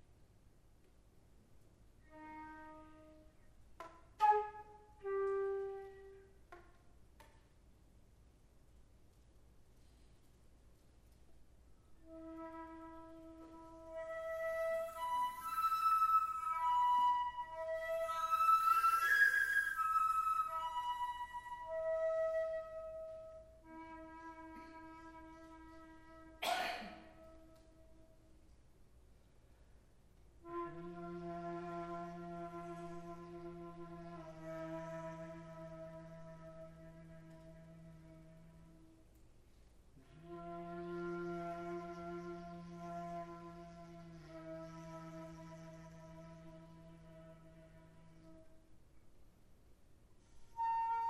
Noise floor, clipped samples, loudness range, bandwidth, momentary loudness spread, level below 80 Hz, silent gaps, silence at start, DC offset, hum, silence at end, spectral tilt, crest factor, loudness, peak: -66 dBFS; under 0.1%; 25 LU; 16 kHz; 25 LU; -68 dBFS; none; 0.1 s; under 0.1%; none; 0 s; -4.5 dB/octave; 22 dB; -39 LUFS; -22 dBFS